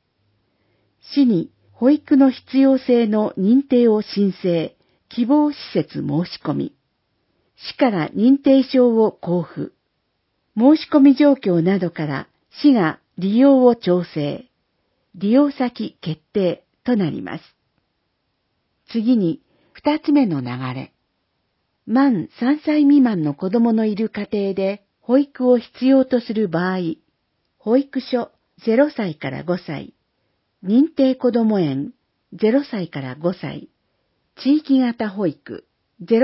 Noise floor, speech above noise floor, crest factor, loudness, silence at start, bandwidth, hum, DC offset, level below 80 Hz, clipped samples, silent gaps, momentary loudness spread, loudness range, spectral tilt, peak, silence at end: -71 dBFS; 54 dB; 18 dB; -18 LUFS; 1.1 s; 5.8 kHz; none; under 0.1%; -64 dBFS; under 0.1%; none; 15 LU; 6 LU; -11.5 dB/octave; -2 dBFS; 0 s